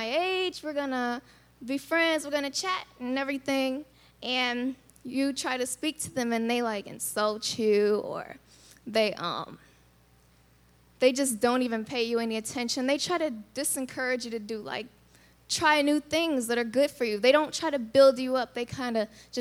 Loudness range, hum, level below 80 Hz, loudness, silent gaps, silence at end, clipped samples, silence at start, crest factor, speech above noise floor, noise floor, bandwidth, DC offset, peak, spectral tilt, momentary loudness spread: 5 LU; 60 Hz at -65 dBFS; -66 dBFS; -28 LUFS; none; 0 s; under 0.1%; 0 s; 20 dB; 33 dB; -61 dBFS; 19.5 kHz; under 0.1%; -8 dBFS; -3 dB/octave; 12 LU